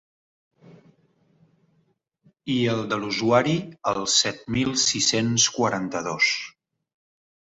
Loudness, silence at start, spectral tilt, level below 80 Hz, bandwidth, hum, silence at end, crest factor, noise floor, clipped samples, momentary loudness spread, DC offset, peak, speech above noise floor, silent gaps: -22 LUFS; 0.7 s; -3 dB/octave; -58 dBFS; 8.4 kHz; none; 1.05 s; 20 dB; -68 dBFS; under 0.1%; 8 LU; under 0.1%; -6 dBFS; 45 dB; none